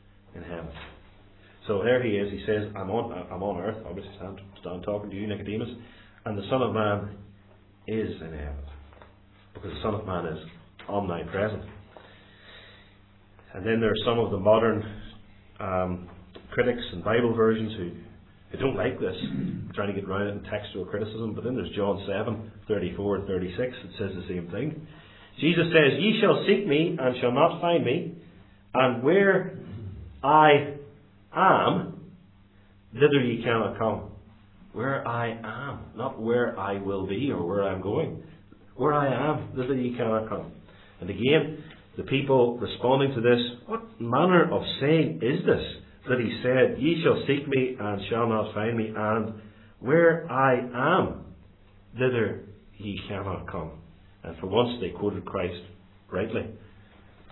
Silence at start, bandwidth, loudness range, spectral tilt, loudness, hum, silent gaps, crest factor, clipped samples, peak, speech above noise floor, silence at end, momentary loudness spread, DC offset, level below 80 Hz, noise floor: 0.35 s; 4.2 kHz; 9 LU; -10.5 dB/octave; -26 LUFS; none; none; 22 dB; under 0.1%; -4 dBFS; 30 dB; 0 s; 19 LU; under 0.1%; -54 dBFS; -55 dBFS